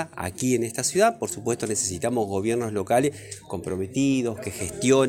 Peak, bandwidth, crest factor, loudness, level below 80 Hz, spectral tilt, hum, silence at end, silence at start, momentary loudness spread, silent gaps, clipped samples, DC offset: -6 dBFS; 17 kHz; 18 dB; -25 LUFS; -56 dBFS; -4.5 dB/octave; none; 0 s; 0 s; 10 LU; none; under 0.1%; under 0.1%